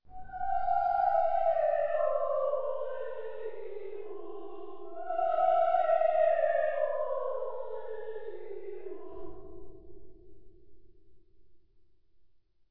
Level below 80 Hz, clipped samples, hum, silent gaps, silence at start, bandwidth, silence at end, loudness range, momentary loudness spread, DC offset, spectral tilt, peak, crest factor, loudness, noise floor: -60 dBFS; under 0.1%; none; none; 0 s; 5.2 kHz; 0 s; 17 LU; 18 LU; 1%; -7.5 dB/octave; -16 dBFS; 16 dB; -30 LUFS; -63 dBFS